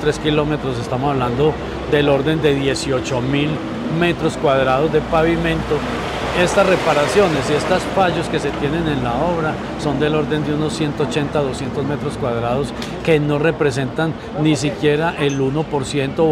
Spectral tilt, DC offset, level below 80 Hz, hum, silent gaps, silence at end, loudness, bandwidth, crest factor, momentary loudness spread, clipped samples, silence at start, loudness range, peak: -6 dB/octave; under 0.1%; -36 dBFS; none; none; 0 s; -18 LUFS; 14.5 kHz; 16 dB; 7 LU; under 0.1%; 0 s; 3 LU; -2 dBFS